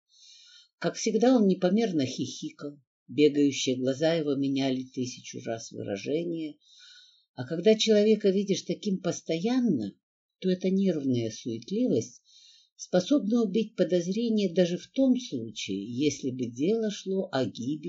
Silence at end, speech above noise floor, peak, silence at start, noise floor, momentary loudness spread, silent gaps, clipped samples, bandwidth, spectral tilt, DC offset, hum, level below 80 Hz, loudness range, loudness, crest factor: 0 s; 31 dB; -10 dBFS; 0.8 s; -58 dBFS; 13 LU; 2.87-3.06 s, 7.29-7.34 s, 10.03-10.29 s, 12.72-12.76 s; under 0.1%; 8 kHz; -5.5 dB/octave; under 0.1%; none; -76 dBFS; 4 LU; -28 LUFS; 18 dB